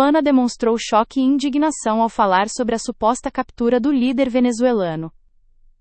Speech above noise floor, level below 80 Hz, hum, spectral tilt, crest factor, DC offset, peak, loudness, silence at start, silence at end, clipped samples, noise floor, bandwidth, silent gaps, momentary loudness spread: 34 dB; -48 dBFS; none; -4.5 dB/octave; 16 dB; under 0.1%; -2 dBFS; -18 LUFS; 0 s; 0.7 s; under 0.1%; -52 dBFS; 8.8 kHz; none; 6 LU